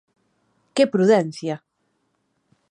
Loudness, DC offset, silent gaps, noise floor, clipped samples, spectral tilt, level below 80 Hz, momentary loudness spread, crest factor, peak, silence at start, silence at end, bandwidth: -20 LUFS; under 0.1%; none; -71 dBFS; under 0.1%; -6 dB/octave; -76 dBFS; 13 LU; 18 dB; -4 dBFS; 0.75 s; 1.15 s; 10 kHz